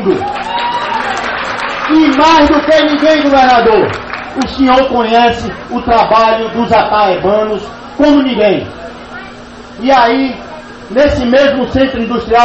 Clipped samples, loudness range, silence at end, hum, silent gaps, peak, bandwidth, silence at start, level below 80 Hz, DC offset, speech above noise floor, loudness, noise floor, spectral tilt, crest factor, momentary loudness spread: under 0.1%; 4 LU; 0 s; none; none; 0 dBFS; 8.6 kHz; 0 s; -34 dBFS; under 0.1%; 21 dB; -10 LUFS; -30 dBFS; -5.5 dB/octave; 10 dB; 18 LU